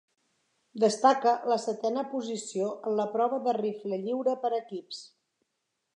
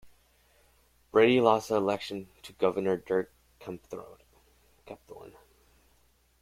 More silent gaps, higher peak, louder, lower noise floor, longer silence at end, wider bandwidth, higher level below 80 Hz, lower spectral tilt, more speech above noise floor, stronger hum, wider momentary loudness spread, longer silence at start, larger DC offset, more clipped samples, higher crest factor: neither; about the same, -8 dBFS vs -8 dBFS; about the same, -29 LUFS vs -27 LUFS; first, -81 dBFS vs -67 dBFS; second, 0.9 s vs 1.15 s; second, 11 kHz vs 15.5 kHz; second, -88 dBFS vs -66 dBFS; about the same, -4.5 dB/octave vs -5.5 dB/octave; first, 53 dB vs 38 dB; neither; second, 13 LU vs 26 LU; first, 0.75 s vs 0.05 s; neither; neither; about the same, 22 dB vs 24 dB